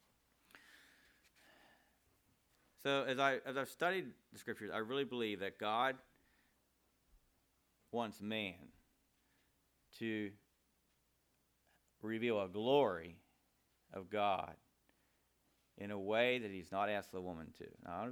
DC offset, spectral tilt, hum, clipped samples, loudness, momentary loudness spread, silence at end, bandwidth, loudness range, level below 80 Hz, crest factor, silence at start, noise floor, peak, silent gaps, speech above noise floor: under 0.1%; -5 dB/octave; none; under 0.1%; -40 LUFS; 17 LU; 0 s; over 20 kHz; 9 LU; -80 dBFS; 24 dB; 0.55 s; -79 dBFS; -18 dBFS; none; 39 dB